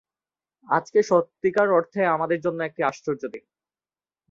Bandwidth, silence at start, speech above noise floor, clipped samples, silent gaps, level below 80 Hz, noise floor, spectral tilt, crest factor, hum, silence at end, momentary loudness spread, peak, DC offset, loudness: 7.6 kHz; 0.7 s; over 67 dB; under 0.1%; none; -70 dBFS; under -90 dBFS; -6 dB/octave; 18 dB; none; 0.9 s; 10 LU; -6 dBFS; under 0.1%; -23 LUFS